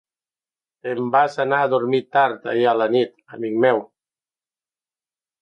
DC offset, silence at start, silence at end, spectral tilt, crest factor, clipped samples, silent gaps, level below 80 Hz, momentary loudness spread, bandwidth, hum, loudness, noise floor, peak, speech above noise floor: under 0.1%; 0.85 s; 1.6 s; -6.5 dB/octave; 18 dB; under 0.1%; none; -74 dBFS; 9 LU; 8.6 kHz; none; -20 LUFS; under -90 dBFS; -4 dBFS; over 71 dB